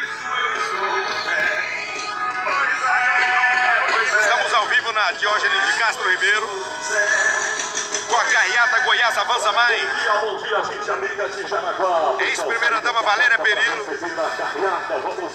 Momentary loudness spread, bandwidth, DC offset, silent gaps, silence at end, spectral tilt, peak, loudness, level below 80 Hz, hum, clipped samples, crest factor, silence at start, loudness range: 8 LU; 14 kHz; under 0.1%; none; 0 s; 0 dB/octave; -4 dBFS; -19 LUFS; -66 dBFS; none; under 0.1%; 16 dB; 0 s; 3 LU